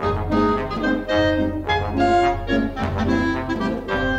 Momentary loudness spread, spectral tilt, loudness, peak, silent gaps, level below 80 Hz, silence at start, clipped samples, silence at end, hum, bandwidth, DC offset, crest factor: 5 LU; -6.5 dB/octave; -21 LUFS; -6 dBFS; none; -34 dBFS; 0 s; under 0.1%; 0 s; none; 9 kHz; under 0.1%; 14 dB